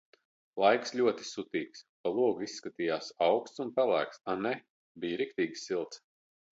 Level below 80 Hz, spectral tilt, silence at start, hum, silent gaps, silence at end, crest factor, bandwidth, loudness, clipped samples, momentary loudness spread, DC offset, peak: -78 dBFS; -4.5 dB/octave; 0.55 s; none; 1.89-2.04 s, 4.70-4.95 s; 0.6 s; 20 dB; 8 kHz; -32 LUFS; under 0.1%; 12 LU; under 0.1%; -12 dBFS